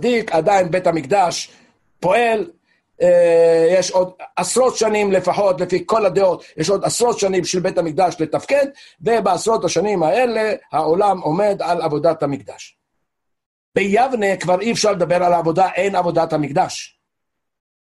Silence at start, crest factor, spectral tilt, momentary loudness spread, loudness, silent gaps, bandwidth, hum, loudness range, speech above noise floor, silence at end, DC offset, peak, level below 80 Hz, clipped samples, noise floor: 0 s; 14 dB; -4.5 dB/octave; 8 LU; -17 LUFS; 13.46-13.72 s; 12.5 kHz; none; 4 LU; 63 dB; 1 s; under 0.1%; -4 dBFS; -56 dBFS; under 0.1%; -80 dBFS